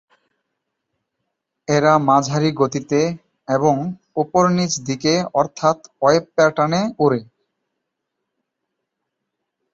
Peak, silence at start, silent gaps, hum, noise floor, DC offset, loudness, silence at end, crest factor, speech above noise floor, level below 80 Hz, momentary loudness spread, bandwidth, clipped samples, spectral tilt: -2 dBFS; 1.7 s; none; none; -78 dBFS; under 0.1%; -18 LUFS; 2.5 s; 18 dB; 61 dB; -60 dBFS; 8 LU; 8 kHz; under 0.1%; -5.5 dB/octave